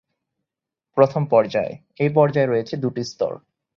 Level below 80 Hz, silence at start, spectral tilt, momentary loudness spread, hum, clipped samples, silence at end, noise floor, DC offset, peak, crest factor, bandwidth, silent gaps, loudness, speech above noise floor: -62 dBFS; 0.95 s; -7.5 dB/octave; 10 LU; none; under 0.1%; 0.4 s; -86 dBFS; under 0.1%; -2 dBFS; 20 dB; 7.2 kHz; none; -21 LUFS; 67 dB